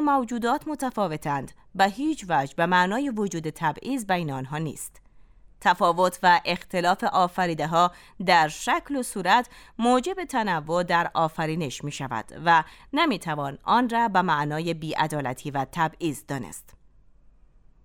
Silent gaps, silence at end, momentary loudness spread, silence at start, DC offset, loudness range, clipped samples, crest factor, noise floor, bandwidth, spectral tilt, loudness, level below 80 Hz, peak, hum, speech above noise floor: none; 1.25 s; 10 LU; 0 s; under 0.1%; 4 LU; under 0.1%; 20 dB; -55 dBFS; 18.5 kHz; -4.5 dB/octave; -25 LUFS; -56 dBFS; -6 dBFS; none; 30 dB